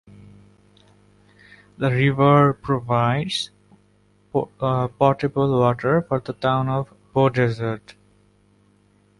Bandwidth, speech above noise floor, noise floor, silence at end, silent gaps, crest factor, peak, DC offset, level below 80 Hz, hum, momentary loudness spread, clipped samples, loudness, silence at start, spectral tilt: 11.5 kHz; 39 dB; -59 dBFS; 1.4 s; none; 20 dB; -2 dBFS; under 0.1%; -54 dBFS; 50 Hz at -45 dBFS; 10 LU; under 0.1%; -21 LUFS; 1.8 s; -7.5 dB/octave